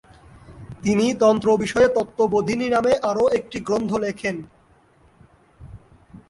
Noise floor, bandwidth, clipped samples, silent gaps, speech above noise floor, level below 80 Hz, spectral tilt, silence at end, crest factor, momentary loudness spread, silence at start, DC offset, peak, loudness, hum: -56 dBFS; 11.5 kHz; under 0.1%; none; 36 dB; -50 dBFS; -5.5 dB/octave; 0.55 s; 16 dB; 10 LU; 0.5 s; under 0.1%; -6 dBFS; -20 LUFS; none